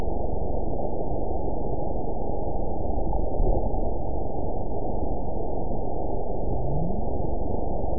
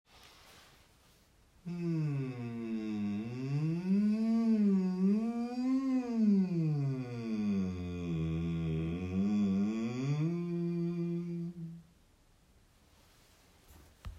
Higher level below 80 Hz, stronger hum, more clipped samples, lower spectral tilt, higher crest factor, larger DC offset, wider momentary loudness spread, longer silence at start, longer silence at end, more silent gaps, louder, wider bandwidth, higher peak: first, -30 dBFS vs -62 dBFS; neither; neither; first, -17.5 dB/octave vs -9 dB/octave; about the same, 16 dB vs 14 dB; first, 8% vs under 0.1%; second, 3 LU vs 10 LU; second, 0 s vs 0.15 s; about the same, 0 s vs 0 s; neither; first, -30 LUFS vs -34 LUFS; second, 1 kHz vs 8.2 kHz; first, -10 dBFS vs -20 dBFS